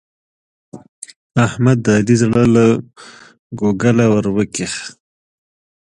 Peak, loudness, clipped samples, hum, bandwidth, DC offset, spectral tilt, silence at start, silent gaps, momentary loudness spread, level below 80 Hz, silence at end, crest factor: 0 dBFS; -15 LUFS; under 0.1%; none; 11 kHz; under 0.1%; -6.5 dB/octave; 0.75 s; 0.89-1.02 s, 1.16-1.30 s, 3.39-3.50 s; 21 LU; -48 dBFS; 0.9 s; 16 dB